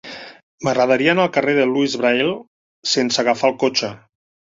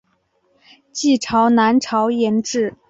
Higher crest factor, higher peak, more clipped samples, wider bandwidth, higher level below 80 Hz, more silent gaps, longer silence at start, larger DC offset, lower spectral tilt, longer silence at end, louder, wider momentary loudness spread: about the same, 18 dB vs 14 dB; about the same, -2 dBFS vs -4 dBFS; neither; about the same, 7.8 kHz vs 7.8 kHz; about the same, -62 dBFS vs -58 dBFS; first, 0.43-0.58 s, 2.47-2.82 s vs none; second, 0.05 s vs 0.95 s; neither; about the same, -4 dB/octave vs -4 dB/octave; first, 0.55 s vs 0.15 s; about the same, -18 LUFS vs -17 LUFS; first, 13 LU vs 7 LU